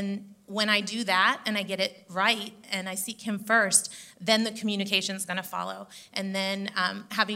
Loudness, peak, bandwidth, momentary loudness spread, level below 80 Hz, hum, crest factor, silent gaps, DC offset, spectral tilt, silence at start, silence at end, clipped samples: -27 LUFS; -6 dBFS; 16 kHz; 12 LU; -80 dBFS; none; 22 dB; none; under 0.1%; -2 dB/octave; 0 s; 0 s; under 0.1%